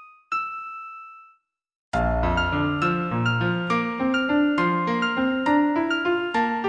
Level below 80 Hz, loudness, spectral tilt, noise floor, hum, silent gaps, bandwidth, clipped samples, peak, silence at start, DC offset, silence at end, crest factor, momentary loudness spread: -38 dBFS; -23 LUFS; -7 dB/octave; -60 dBFS; none; 1.75-1.92 s; 9.4 kHz; under 0.1%; -8 dBFS; 0 s; under 0.1%; 0 s; 14 dB; 10 LU